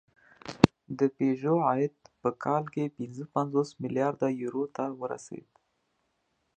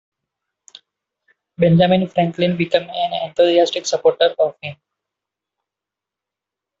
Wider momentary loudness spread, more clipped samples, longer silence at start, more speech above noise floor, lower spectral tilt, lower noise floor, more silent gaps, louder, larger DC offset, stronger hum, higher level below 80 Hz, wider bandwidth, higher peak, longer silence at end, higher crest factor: first, 14 LU vs 8 LU; neither; second, 0.45 s vs 1.6 s; second, 47 dB vs 69 dB; first, -7 dB/octave vs -5.5 dB/octave; second, -76 dBFS vs -86 dBFS; neither; second, -30 LUFS vs -17 LUFS; neither; neither; about the same, -60 dBFS vs -58 dBFS; first, 9.2 kHz vs 7.8 kHz; about the same, 0 dBFS vs -2 dBFS; second, 1.15 s vs 2.05 s; first, 30 dB vs 18 dB